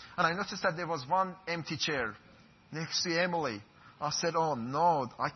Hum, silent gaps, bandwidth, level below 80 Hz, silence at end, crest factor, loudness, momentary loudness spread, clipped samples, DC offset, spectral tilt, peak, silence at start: none; none; 6.4 kHz; -68 dBFS; 0 s; 18 dB; -32 LUFS; 9 LU; under 0.1%; under 0.1%; -2.5 dB/octave; -14 dBFS; 0 s